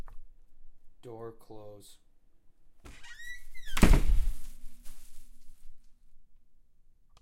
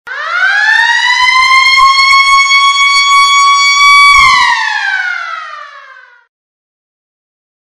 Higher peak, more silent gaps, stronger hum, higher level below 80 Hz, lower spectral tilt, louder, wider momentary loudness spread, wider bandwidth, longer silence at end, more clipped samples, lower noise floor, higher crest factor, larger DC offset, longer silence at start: second, -4 dBFS vs 0 dBFS; neither; neither; first, -34 dBFS vs -42 dBFS; first, -5.5 dB/octave vs 3 dB/octave; second, -32 LUFS vs -5 LUFS; first, 29 LU vs 12 LU; about the same, 16 kHz vs 15.5 kHz; second, 0.85 s vs 1.85 s; second, under 0.1% vs 0.4%; first, -58 dBFS vs -36 dBFS; first, 26 dB vs 8 dB; neither; about the same, 0 s vs 0.05 s